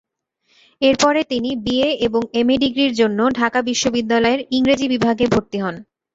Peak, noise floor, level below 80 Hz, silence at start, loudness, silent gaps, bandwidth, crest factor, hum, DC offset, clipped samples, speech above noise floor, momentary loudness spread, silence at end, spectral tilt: -2 dBFS; -65 dBFS; -48 dBFS; 0.8 s; -18 LUFS; none; 7.8 kHz; 16 dB; none; under 0.1%; under 0.1%; 47 dB; 5 LU; 0.35 s; -4 dB/octave